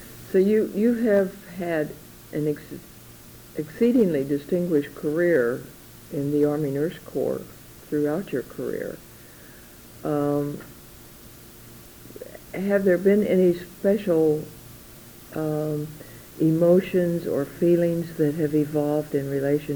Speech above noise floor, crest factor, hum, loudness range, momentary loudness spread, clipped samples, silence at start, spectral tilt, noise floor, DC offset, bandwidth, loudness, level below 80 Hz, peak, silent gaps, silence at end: 23 dB; 16 dB; none; 8 LU; 24 LU; under 0.1%; 0 s; -7.5 dB/octave; -46 dBFS; under 0.1%; over 20 kHz; -24 LUFS; -56 dBFS; -8 dBFS; none; 0 s